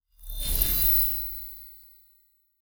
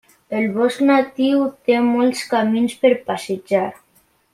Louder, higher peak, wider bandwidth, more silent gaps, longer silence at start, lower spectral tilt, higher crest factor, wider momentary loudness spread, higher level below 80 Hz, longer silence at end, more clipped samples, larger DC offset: second, -22 LUFS vs -18 LUFS; about the same, -4 dBFS vs -2 dBFS; first, over 20 kHz vs 14.5 kHz; neither; about the same, 0.2 s vs 0.3 s; second, -2 dB/octave vs -5.5 dB/octave; first, 24 dB vs 16 dB; first, 23 LU vs 7 LU; first, -36 dBFS vs -64 dBFS; first, 0.85 s vs 0.6 s; neither; neither